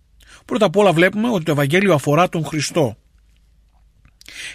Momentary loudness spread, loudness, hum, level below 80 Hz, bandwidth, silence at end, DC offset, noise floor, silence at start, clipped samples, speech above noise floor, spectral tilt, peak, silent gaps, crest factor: 10 LU; -17 LUFS; none; -52 dBFS; 15 kHz; 0 s; under 0.1%; -54 dBFS; 0.5 s; under 0.1%; 37 dB; -5.5 dB/octave; -2 dBFS; none; 16 dB